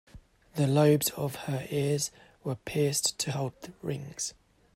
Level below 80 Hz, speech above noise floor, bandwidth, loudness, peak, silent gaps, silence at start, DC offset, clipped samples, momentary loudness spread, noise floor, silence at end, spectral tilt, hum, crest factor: -62 dBFS; 23 dB; 16 kHz; -29 LUFS; -10 dBFS; none; 0.15 s; under 0.1%; under 0.1%; 13 LU; -53 dBFS; 0.45 s; -4.5 dB/octave; none; 20 dB